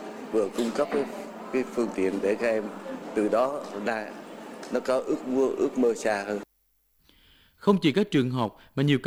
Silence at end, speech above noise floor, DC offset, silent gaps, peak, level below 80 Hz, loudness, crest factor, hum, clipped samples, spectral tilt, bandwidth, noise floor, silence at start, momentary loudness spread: 0 s; 43 dB; under 0.1%; none; -8 dBFS; -66 dBFS; -27 LUFS; 20 dB; none; under 0.1%; -6 dB/octave; over 20 kHz; -69 dBFS; 0 s; 11 LU